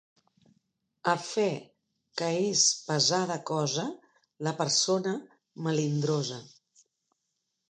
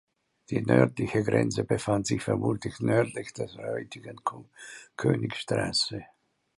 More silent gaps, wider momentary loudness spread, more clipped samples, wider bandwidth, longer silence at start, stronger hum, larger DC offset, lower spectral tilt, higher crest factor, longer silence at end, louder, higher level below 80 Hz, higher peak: neither; about the same, 13 LU vs 14 LU; neither; second, 10 kHz vs 11.5 kHz; first, 1.05 s vs 0.5 s; neither; neither; second, -3.5 dB/octave vs -5.5 dB/octave; about the same, 22 dB vs 24 dB; first, 1.25 s vs 0.5 s; about the same, -28 LUFS vs -28 LUFS; second, -80 dBFS vs -58 dBFS; second, -10 dBFS vs -6 dBFS